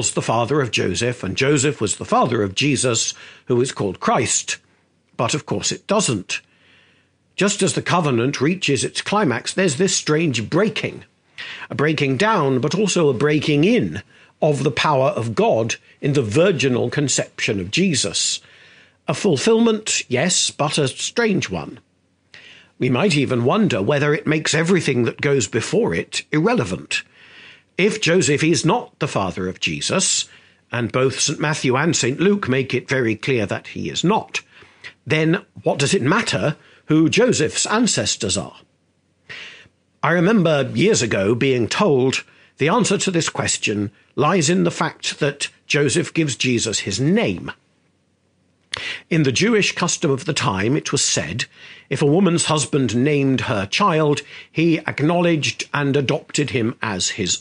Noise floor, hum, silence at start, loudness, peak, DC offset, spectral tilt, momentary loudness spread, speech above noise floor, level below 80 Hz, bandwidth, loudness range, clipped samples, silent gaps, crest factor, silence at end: -63 dBFS; none; 0 s; -19 LUFS; 0 dBFS; under 0.1%; -4 dB/octave; 9 LU; 44 dB; -58 dBFS; 10 kHz; 3 LU; under 0.1%; none; 20 dB; 0 s